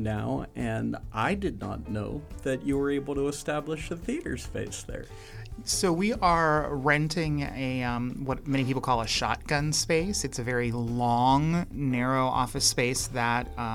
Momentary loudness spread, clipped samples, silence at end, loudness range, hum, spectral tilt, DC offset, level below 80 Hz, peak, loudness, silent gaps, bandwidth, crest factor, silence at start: 11 LU; under 0.1%; 0 s; 5 LU; none; -4.5 dB/octave; under 0.1%; -44 dBFS; -10 dBFS; -28 LUFS; none; 16.5 kHz; 18 dB; 0 s